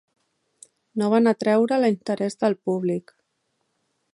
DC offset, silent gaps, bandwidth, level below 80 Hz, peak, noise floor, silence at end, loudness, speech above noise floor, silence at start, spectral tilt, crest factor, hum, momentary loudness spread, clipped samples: under 0.1%; none; 11 kHz; -74 dBFS; -8 dBFS; -74 dBFS; 1.15 s; -22 LUFS; 52 dB; 0.95 s; -6.5 dB/octave; 16 dB; none; 8 LU; under 0.1%